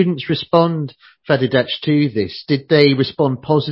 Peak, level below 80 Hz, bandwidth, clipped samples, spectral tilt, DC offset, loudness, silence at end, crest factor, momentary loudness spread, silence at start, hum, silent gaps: 0 dBFS; -52 dBFS; 5.8 kHz; under 0.1%; -9.5 dB/octave; under 0.1%; -17 LUFS; 0 s; 16 dB; 8 LU; 0 s; none; none